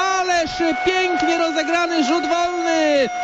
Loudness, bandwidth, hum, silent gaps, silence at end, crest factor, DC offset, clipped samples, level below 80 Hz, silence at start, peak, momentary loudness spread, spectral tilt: -18 LUFS; 8.4 kHz; none; none; 0 s; 12 dB; under 0.1%; under 0.1%; -50 dBFS; 0 s; -8 dBFS; 2 LU; -2.5 dB/octave